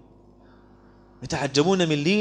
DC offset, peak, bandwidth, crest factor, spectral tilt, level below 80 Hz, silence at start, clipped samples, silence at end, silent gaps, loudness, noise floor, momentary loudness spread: under 0.1%; -6 dBFS; 10 kHz; 18 dB; -5 dB/octave; -54 dBFS; 1.2 s; under 0.1%; 0 s; none; -23 LUFS; -52 dBFS; 12 LU